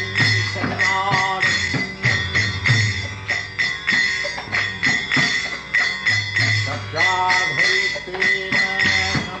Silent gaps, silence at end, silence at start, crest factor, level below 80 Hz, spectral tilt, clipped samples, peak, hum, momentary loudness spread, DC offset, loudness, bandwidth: none; 0 s; 0 s; 14 dB; -46 dBFS; -3 dB/octave; under 0.1%; -6 dBFS; none; 6 LU; under 0.1%; -18 LUFS; 9 kHz